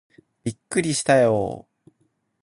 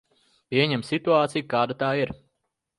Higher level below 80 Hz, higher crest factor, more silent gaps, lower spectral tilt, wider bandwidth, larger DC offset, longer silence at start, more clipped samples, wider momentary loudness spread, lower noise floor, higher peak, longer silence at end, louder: about the same, -56 dBFS vs -60 dBFS; about the same, 20 dB vs 18 dB; neither; second, -4.5 dB/octave vs -6 dB/octave; about the same, 11.5 kHz vs 11.5 kHz; neither; about the same, 0.45 s vs 0.5 s; neither; first, 15 LU vs 6 LU; second, -69 dBFS vs -79 dBFS; about the same, -4 dBFS vs -6 dBFS; first, 0.8 s vs 0.65 s; about the same, -22 LUFS vs -24 LUFS